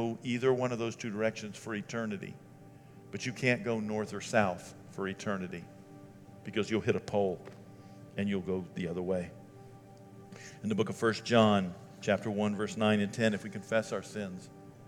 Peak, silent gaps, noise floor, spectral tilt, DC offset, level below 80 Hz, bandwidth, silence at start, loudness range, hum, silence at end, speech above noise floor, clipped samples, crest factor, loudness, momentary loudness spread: -10 dBFS; none; -53 dBFS; -5.5 dB/octave; under 0.1%; -72 dBFS; 13 kHz; 0 s; 6 LU; none; 0 s; 21 dB; under 0.1%; 24 dB; -33 LUFS; 23 LU